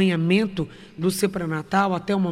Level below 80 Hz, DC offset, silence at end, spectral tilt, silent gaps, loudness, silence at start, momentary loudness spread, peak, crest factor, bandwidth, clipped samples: -52 dBFS; under 0.1%; 0 s; -6 dB/octave; none; -23 LUFS; 0 s; 8 LU; -8 dBFS; 14 dB; 15.5 kHz; under 0.1%